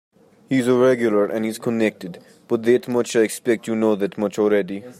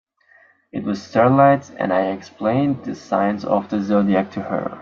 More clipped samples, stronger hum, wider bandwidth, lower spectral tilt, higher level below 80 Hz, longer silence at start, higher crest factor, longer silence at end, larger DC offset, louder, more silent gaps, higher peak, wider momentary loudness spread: neither; neither; first, 15.5 kHz vs 7.2 kHz; second, -5.5 dB/octave vs -8 dB/octave; second, -68 dBFS vs -62 dBFS; second, 0.5 s vs 0.75 s; about the same, 16 dB vs 18 dB; about the same, 0.05 s vs 0 s; neither; about the same, -20 LUFS vs -19 LUFS; neither; about the same, -4 dBFS vs -2 dBFS; second, 7 LU vs 11 LU